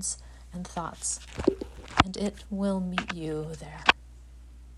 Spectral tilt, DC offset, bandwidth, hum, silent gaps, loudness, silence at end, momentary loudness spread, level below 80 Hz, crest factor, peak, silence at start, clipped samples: -3.5 dB/octave; under 0.1%; 13 kHz; none; none; -29 LUFS; 0 s; 15 LU; -46 dBFS; 30 dB; 0 dBFS; 0 s; under 0.1%